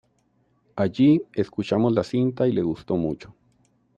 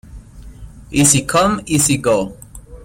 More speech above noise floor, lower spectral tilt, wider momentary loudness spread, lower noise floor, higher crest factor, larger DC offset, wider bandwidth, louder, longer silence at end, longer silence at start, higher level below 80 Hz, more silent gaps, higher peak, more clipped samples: first, 44 dB vs 21 dB; first, -8.5 dB/octave vs -4 dB/octave; about the same, 10 LU vs 8 LU; first, -66 dBFS vs -36 dBFS; about the same, 16 dB vs 18 dB; neither; second, 8.2 kHz vs 16.5 kHz; second, -23 LUFS vs -14 LUFS; first, 0.8 s vs 0.05 s; first, 0.75 s vs 0.1 s; second, -58 dBFS vs -38 dBFS; neither; second, -8 dBFS vs 0 dBFS; neither